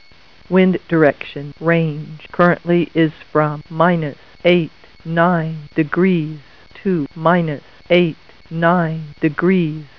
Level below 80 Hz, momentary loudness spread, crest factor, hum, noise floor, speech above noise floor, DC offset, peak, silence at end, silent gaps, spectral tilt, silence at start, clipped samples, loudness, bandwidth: -52 dBFS; 13 LU; 18 dB; none; -47 dBFS; 31 dB; 0.5%; 0 dBFS; 0.15 s; none; -9.5 dB/octave; 0.5 s; under 0.1%; -17 LUFS; 5.4 kHz